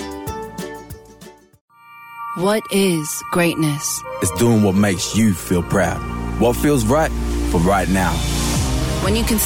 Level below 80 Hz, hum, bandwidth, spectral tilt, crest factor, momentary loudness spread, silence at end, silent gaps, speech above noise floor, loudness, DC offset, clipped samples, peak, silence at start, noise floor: -28 dBFS; none; 17.5 kHz; -5 dB/octave; 12 dB; 13 LU; 0 s; 1.61-1.68 s; 26 dB; -18 LUFS; under 0.1%; under 0.1%; -6 dBFS; 0 s; -43 dBFS